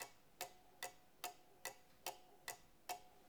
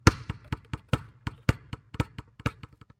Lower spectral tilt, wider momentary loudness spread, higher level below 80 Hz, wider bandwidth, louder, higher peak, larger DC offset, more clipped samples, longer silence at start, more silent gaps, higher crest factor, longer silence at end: second, -0.5 dB/octave vs -5.5 dB/octave; second, 1 LU vs 10 LU; second, -82 dBFS vs -40 dBFS; first, over 20 kHz vs 16 kHz; second, -53 LUFS vs -33 LUFS; second, -30 dBFS vs 0 dBFS; neither; neither; about the same, 0 s vs 0.05 s; neither; about the same, 26 dB vs 30 dB; second, 0 s vs 0.5 s